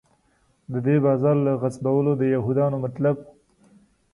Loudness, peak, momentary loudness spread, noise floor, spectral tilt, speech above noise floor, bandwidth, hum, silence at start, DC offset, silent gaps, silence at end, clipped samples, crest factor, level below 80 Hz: -22 LUFS; -8 dBFS; 6 LU; -64 dBFS; -10 dB/octave; 43 dB; 11.5 kHz; none; 0.7 s; under 0.1%; none; 0.85 s; under 0.1%; 14 dB; -60 dBFS